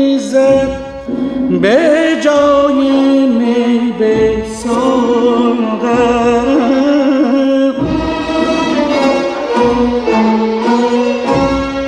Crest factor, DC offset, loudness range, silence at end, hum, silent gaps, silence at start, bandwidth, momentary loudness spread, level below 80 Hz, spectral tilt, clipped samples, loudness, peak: 10 dB; under 0.1%; 2 LU; 0 s; none; none; 0 s; 10.5 kHz; 5 LU; -36 dBFS; -5.5 dB/octave; under 0.1%; -12 LUFS; 0 dBFS